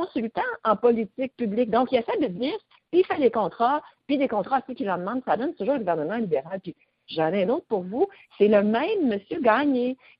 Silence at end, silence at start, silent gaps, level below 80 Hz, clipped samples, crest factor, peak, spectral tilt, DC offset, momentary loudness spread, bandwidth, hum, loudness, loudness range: 0.25 s; 0 s; none; -66 dBFS; under 0.1%; 18 dB; -6 dBFS; -10.5 dB/octave; under 0.1%; 8 LU; 5.4 kHz; none; -25 LUFS; 3 LU